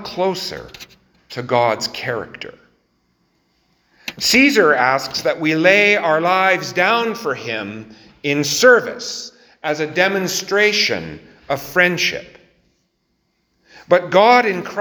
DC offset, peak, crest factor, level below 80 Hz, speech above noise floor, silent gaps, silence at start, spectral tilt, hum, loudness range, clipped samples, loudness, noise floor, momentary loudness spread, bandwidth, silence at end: under 0.1%; 0 dBFS; 18 dB; -58 dBFS; 51 dB; none; 0 s; -3 dB/octave; none; 9 LU; under 0.1%; -16 LUFS; -68 dBFS; 19 LU; over 20 kHz; 0 s